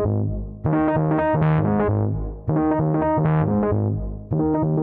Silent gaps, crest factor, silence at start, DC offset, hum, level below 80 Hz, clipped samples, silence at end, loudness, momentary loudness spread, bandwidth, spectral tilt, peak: none; 12 dB; 0 s; under 0.1%; none; -36 dBFS; under 0.1%; 0 s; -21 LUFS; 7 LU; 3.6 kHz; -13 dB/octave; -8 dBFS